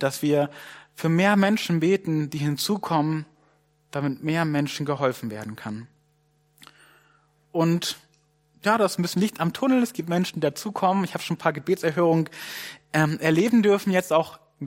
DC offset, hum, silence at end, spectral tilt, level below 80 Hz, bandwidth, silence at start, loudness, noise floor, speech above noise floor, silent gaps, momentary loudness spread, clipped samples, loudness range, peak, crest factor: under 0.1%; none; 0 s; -5.5 dB/octave; -68 dBFS; 16.5 kHz; 0 s; -24 LUFS; -65 dBFS; 42 dB; none; 14 LU; under 0.1%; 7 LU; -6 dBFS; 20 dB